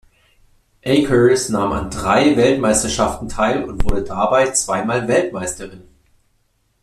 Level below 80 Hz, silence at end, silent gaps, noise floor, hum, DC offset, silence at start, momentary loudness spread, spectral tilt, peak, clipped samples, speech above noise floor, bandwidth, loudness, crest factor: -32 dBFS; 1 s; none; -63 dBFS; none; under 0.1%; 0.85 s; 9 LU; -4.5 dB/octave; -2 dBFS; under 0.1%; 46 dB; 14 kHz; -17 LUFS; 16 dB